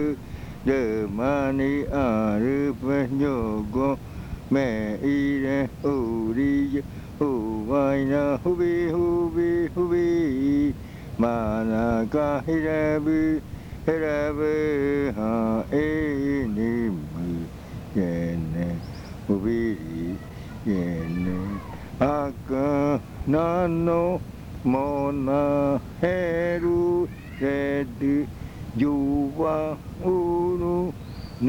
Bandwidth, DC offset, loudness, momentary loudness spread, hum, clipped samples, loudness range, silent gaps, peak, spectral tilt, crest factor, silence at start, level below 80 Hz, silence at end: 18 kHz; under 0.1%; -25 LUFS; 9 LU; none; under 0.1%; 4 LU; none; -10 dBFS; -8.5 dB/octave; 16 dB; 0 s; -42 dBFS; 0 s